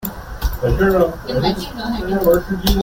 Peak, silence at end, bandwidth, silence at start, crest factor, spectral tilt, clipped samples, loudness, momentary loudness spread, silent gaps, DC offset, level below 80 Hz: 0 dBFS; 0 s; 17 kHz; 0 s; 16 dB; -6 dB/octave; under 0.1%; -18 LUFS; 10 LU; none; under 0.1%; -26 dBFS